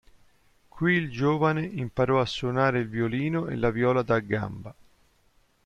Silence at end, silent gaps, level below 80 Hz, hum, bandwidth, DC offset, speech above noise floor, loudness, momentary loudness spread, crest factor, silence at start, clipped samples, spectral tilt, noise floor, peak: 0.95 s; none; -52 dBFS; none; 9.4 kHz; under 0.1%; 39 dB; -26 LUFS; 7 LU; 16 dB; 0.75 s; under 0.1%; -7.5 dB/octave; -64 dBFS; -10 dBFS